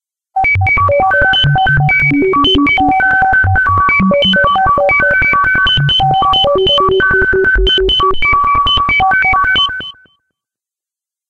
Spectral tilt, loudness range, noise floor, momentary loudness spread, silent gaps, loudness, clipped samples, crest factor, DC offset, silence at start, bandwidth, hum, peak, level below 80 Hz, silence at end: -6 dB/octave; 1 LU; -87 dBFS; 2 LU; none; -9 LUFS; under 0.1%; 8 dB; under 0.1%; 0.35 s; 8.4 kHz; none; -2 dBFS; -26 dBFS; 1.4 s